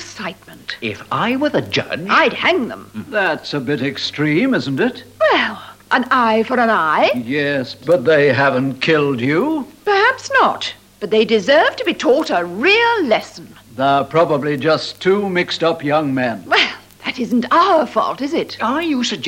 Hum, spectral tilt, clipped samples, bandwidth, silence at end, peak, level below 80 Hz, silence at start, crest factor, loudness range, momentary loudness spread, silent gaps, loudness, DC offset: none; -5 dB/octave; under 0.1%; 16.5 kHz; 0 s; -2 dBFS; -58 dBFS; 0 s; 14 dB; 3 LU; 10 LU; none; -16 LUFS; under 0.1%